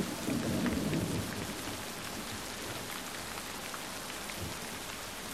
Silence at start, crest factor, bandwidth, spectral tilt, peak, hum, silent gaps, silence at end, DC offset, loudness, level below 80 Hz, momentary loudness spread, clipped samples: 0 s; 18 dB; 16 kHz; -4 dB/octave; -20 dBFS; none; none; 0 s; 0.1%; -37 LUFS; -56 dBFS; 7 LU; under 0.1%